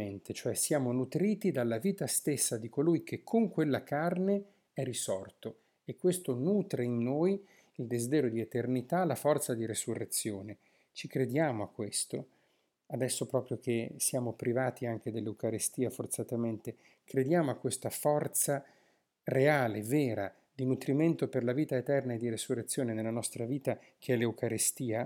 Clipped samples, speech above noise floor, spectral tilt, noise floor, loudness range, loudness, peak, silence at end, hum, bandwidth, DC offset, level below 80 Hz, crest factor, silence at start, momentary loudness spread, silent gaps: under 0.1%; 42 dB; -5 dB/octave; -75 dBFS; 3 LU; -33 LUFS; -14 dBFS; 0 s; none; 19 kHz; under 0.1%; -80 dBFS; 18 dB; 0 s; 9 LU; none